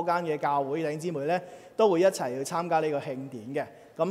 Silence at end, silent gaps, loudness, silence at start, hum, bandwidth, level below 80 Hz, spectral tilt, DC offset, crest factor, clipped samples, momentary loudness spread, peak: 0 s; none; -28 LUFS; 0 s; none; 16 kHz; -78 dBFS; -5.5 dB/octave; under 0.1%; 18 dB; under 0.1%; 11 LU; -10 dBFS